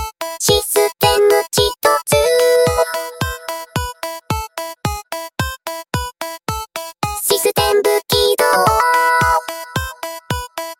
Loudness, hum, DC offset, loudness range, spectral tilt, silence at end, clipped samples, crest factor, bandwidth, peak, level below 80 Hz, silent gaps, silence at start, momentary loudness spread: -16 LUFS; none; under 0.1%; 9 LU; -3 dB/octave; 0.05 s; under 0.1%; 16 dB; 17 kHz; -2 dBFS; -36 dBFS; none; 0 s; 13 LU